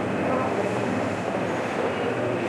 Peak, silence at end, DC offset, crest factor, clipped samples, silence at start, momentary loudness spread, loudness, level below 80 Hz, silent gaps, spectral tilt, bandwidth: -12 dBFS; 0 s; under 0.1%; 14 dB; under 0.1%; 0 s; 2 LU; -26 LUFS; -60 dBFS; none; -6 dB/octave; 13 kHz